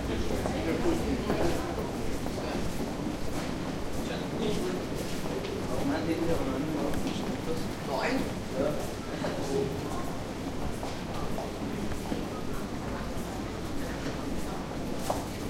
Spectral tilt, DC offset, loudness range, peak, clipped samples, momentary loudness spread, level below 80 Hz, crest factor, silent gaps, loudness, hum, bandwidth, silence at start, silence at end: -5.5 dB/octave; under 0.1%; 4 LU; -16 dBFS; under 0.1%; 6 LU; -42 dBFS; 16 dB; none; -33 LUFS; none; 16 kHz; 0 s; 0 s